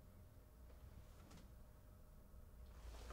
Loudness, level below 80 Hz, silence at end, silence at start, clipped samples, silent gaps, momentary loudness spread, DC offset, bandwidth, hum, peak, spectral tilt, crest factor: -64 LUFS; -62 dBFS; 0 s; 0 s; under 0.1%; none; 6 LU; under 0.1%; 16 kHz; none; -42 dBFS; -5.5 dB/octave; 18 dB